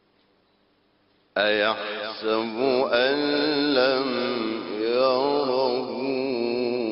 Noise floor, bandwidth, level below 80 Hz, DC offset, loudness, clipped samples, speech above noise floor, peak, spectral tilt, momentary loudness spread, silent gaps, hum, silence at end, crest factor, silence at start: -65 dBFS; 5.8 kHz; -68 dBFS; under 0.1%; -24 LUFS; under 0.1%; 42 dB; -6 dBFS; -1.5 dB/octave; 7 LU; none; none; 0 s; 18 dB; 1.35 s